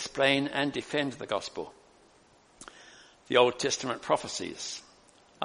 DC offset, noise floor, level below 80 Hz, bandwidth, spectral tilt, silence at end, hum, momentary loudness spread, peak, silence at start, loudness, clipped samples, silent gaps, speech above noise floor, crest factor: under 0.1%; -61 dBFS; -68 dBFS; 10.5 kHz; -3 dB/octave; 0 s; none; 21 LU; -8 dBFS; 0 s; -29 LUFS; under 0.1%; none; 32 dB; 24 dB